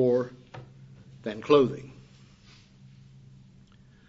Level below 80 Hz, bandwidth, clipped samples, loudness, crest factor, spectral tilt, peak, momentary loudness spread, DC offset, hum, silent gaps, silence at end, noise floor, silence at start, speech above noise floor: -64 dBFS; 7.6 kHz; under 0.1%; -26 LUFS; 24 dB; -7.5 dB/octave; -6 dBFS; 27 LU; under 0.1%; none; none; 2.2 s; -55 dBFS; 0 s; 31 dB